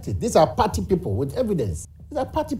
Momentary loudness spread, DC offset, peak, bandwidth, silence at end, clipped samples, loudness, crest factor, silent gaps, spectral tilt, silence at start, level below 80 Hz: 11 LU; under 0.1%; -4 dBFS; 16 kHz; 0 s; under 0.1%; -23 LUFS; 18 dB; none; -6.5 dB/octave; 0 s; -38 dBFS